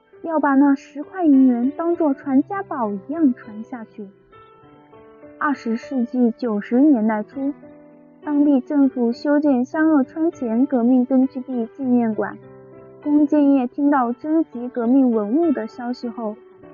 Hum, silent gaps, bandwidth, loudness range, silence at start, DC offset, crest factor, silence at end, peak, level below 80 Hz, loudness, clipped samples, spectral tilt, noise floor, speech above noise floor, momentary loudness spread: none; none; 6.8 kHz; 6 LU; 0.25 s; under 0.1%; 12 dB; 0.05 s; -8 dBFS; -68 dBFS; -19 LUFS; under 0.1%; -6.5 dB/octave; -48 dBFS; 29 dB; 13 LU